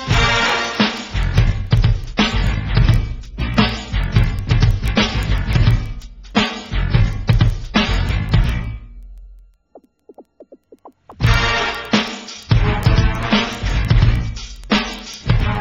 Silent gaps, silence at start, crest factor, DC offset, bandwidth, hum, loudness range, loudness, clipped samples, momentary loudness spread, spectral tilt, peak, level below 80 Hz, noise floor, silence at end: none; 0 s; 18 dB; under 0.1%; 10 kHz; none; 5 LU; -18 LUFS; under 0.1%; 8 LU; -5.5 dB/octave; 0 dBFS; -22 dBFS; -49 dBFS; 0 s